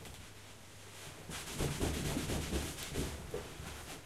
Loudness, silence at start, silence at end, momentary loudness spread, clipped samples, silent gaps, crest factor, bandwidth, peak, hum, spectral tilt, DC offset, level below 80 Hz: -40 LUFS; 0 s; 0 s; 15 LU; under 0.1%; none; 20 dB; 16 kHz; -22 dBFS; none; -4 dB/octave; under 0.1%; -48 dBFS